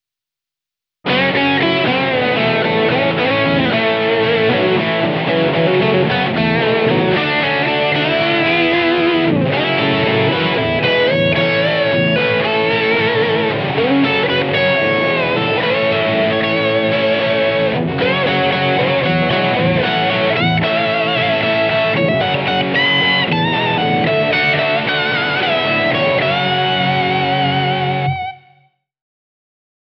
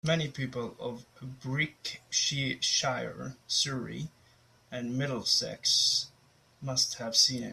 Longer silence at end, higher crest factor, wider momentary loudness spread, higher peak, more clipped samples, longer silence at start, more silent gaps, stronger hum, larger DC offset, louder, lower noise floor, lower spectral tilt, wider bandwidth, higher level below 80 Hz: first, 1.45 s vs 0 s; second, 12 dB vs 22 dB; second, 2 LU vs 18 LU; first, -2 dBFS vs -10 dBFS; neither; first, 1.05 s vs 0.05 s; neither; neither; neither; first, -14 LUFS vs -29 LUFS; first, -86 dBFS vs -63 dBFS; first, -7.5 dB/octave vs -2.5 dB/octave; second, 6.2 kHz vs 15 kHz; first, -50 dBFS vs -66 dBFS